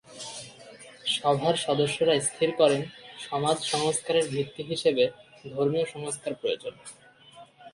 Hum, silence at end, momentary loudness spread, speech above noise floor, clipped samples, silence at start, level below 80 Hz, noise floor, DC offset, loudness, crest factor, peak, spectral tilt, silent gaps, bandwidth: none; 0.05 s; 17 LU; 26 dB; under 0.1%; 0.1 s; -68 dBFS; -52 dBFS; under 0.1%; -27 LUFS; 20 dB; -8 dBFS; -3.5 dB/octave; none; 11.5 kHz